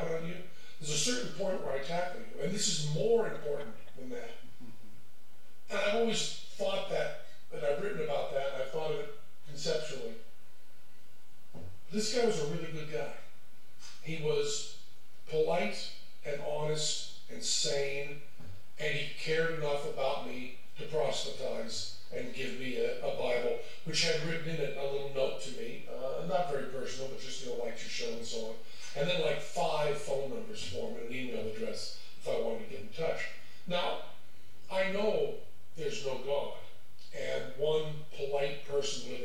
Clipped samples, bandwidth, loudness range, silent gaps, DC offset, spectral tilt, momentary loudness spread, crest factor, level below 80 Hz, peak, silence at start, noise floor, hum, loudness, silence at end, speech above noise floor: under 0.1%; 17 kHz; 4 LU; none; 2%; -3.5 dB/octave; 16 LU; 18 dB; -76 dBFS; -16 dBFS; 0 s; -64 dBFS; none; -35 LUFS; 0 s; 29 dB